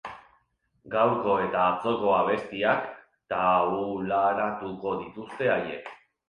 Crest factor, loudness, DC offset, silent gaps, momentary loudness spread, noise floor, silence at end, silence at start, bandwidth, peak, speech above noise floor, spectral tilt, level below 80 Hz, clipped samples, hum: 18 dB; -26 LUFS; under 0.1%; none; 12 LU; -69 dBFS; 0.35 s; 0.05 s; 9.8 kHz; -10 dBFS; 43 dB; -7 dB/octave; -62 dBFS; under 0.1%; none